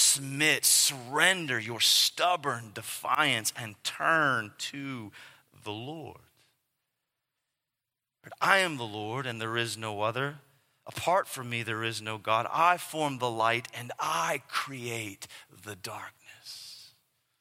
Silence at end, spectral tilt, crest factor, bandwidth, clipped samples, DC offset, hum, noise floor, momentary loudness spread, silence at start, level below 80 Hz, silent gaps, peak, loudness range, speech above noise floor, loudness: 0.55 s; -1.5 dB/octave; 26 dB; 16.5 kHz; under 0.1%; under 0.1%; none; -88 dBFS; 20 LU; 0 s; -78 dBFS; none; -4 dBFS; 12 LU; 58 dB; -28 LUFS